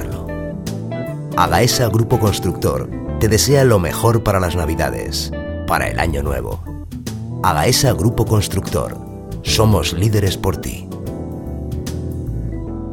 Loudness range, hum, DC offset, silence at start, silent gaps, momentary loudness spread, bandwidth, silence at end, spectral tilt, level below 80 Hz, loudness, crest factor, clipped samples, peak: 4 LU; none; under 0.1%; 0 s; none; 13 LU; 17.5 kHz; 0 s; -5 dB/octave; -30 dBFS; -18 LUFS; 18 dB; under 0.1%; 0 dBFS